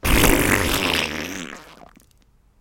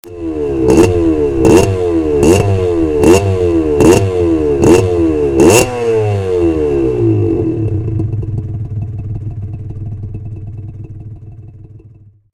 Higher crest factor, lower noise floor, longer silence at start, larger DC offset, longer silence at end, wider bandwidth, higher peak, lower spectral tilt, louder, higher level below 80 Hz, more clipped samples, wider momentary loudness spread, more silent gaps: first, 22 dB vs 12 dB; first, -57 dBFS vs -41 dBFS; about the same, 0.05 s vs 0.05 s; second, under 0.1% vs 0.3%; first, 1 s vs 0.55 s; about the same, 17.5 kHz vs 16.5 kHz; about the same, 0 dBFS vs 0 dBFS; second, -3.5 dB/octave vs -6.5 dB/octave; second, -19 LUFS vs -12 LUFS; about the same, -30 dBFS vs -28 dBFS; second, under 0.1% vs 0.3%; about the same, 18 LU vs 17 LU; neither